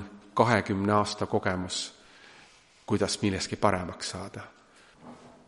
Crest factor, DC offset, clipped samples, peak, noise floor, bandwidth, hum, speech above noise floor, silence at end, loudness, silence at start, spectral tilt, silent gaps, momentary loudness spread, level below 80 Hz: 24 dB; under 0.1%; under 0.1%; -6 dBFS; -57 dBFS; 11.5 kHz; none; 29 dB; 0.2 s; -28 LUFS; 0 s; -4.5 dB/octave; none; 21 LU; -60 dBFS